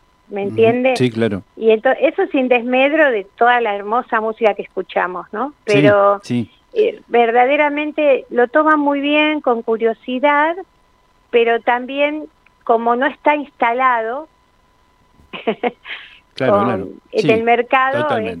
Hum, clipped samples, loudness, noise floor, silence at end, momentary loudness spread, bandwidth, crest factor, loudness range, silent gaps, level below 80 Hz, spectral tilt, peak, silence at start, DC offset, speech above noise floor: none; under 0.1%; -16 LUFS; -55 dBFS; 0 s; 11 LU; 10.5 kHz; 16 dB; 5 LU; none; -60 dBFS; -6.5 dB/octave; 0 dBFS; 0.3 s; under 0.1%; 40 dB